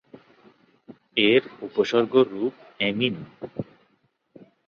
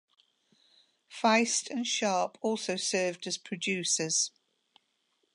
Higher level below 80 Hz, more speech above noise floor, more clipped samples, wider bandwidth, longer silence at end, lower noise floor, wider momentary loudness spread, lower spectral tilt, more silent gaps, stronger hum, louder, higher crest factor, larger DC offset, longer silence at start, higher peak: first, -66 dBFS vs -84 dBFS; about the same, 45 dB vs 46 dB; neither; second, 6.8 kHz vs 11.5 kHz; about the same, 1.05 s vs 1.05 s; second, -68 dBFS vs -76 dBFS; first, 17 LU vs 8 LU; first, -6 dB/octave vs -2 dB/octave; neither; neither; first, -23 LUFS vs -29 LUFS; about the same, 20 dB vs 20 dB; neither; second, 0.9 s vs 1.1 s; first, -6 dBFS vs -12 dBFS